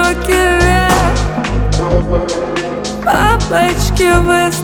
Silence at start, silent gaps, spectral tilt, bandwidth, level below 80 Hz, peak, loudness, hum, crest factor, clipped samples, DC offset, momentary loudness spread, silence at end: 0 s; none; -5 dB/octave; 19.5 kHz; -20 dBFS; 0 dBFS; -13 LUFS; none; 12 dB; under 0.1%; under 0.1%; 7 LU; 0 s